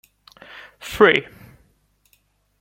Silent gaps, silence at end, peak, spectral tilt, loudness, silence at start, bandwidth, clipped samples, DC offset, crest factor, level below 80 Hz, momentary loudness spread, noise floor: none; 1.4 s; 0 dBFS; -4.5 dB/octave; -16 LUFS; 0.85 s; 16.5 kHz; under 0.1%; under 0.1%; 24 dB; -54 dBFS; 26 LU; -63 dBFS